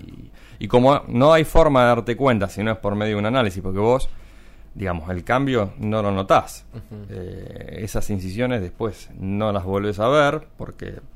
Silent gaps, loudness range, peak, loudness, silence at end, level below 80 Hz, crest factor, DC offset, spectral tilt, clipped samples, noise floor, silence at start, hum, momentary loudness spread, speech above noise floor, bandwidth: none; 7 LU; 0 dBFS; -20 LUFS; 0.1 s; -34 dBFS; 20 dB; under 0.1%; -6.5 dB/octave; under 0.1%; -42 dBFS; 0 s; none; 19 LU; 22 dB; 16 kHz